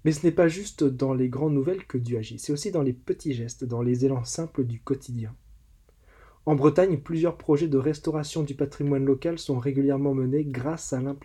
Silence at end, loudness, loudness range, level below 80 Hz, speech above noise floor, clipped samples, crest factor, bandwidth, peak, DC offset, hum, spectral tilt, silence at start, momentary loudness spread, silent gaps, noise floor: 0.05 s; -26 LUFS; 4 LU; -54 dBFS; 32 dB; under 0.1%; 18 dB; 12.5 kHz; -8 dBFS; under 0.1%; none; -7 dB/octave; 0.05 s; 9 LU; none; -57 dBFS